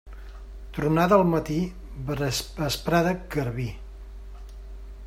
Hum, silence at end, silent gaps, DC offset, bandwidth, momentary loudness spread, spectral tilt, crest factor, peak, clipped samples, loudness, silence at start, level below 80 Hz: none; 0 s; none; under 0.1%; 16 kHz; 24 LU; -5.5 dB/octave; 22 dB; -4 dBFS; under 0.1%; -25 LUFS; 0.05 s; -40 dBFS